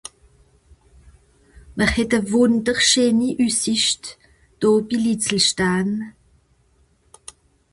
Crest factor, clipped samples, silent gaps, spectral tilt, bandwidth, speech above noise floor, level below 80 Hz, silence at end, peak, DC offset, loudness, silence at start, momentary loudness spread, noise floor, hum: 20 dB; under 0.1%; none; -3 dB/octave; 11.5 kHz; 41 dB; -44 dBFS; 1.6 s; -2 dBFS; under 0.1%; -18 LUFS; 1.7 s; 12 LU; -60 dBFS; none